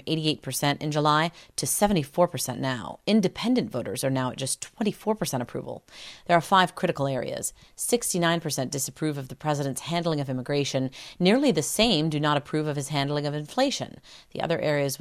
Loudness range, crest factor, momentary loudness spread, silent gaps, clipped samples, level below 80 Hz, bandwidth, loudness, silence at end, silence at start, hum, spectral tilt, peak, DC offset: 3 LU; 20 dB; 10 LU; none; under 0.1%; -56 dBFS; 16 kHz; -26 LUFS; 0.05 s; 0.05 s; none; -4.5 dB/octave; -6 dBFS; under 0.1%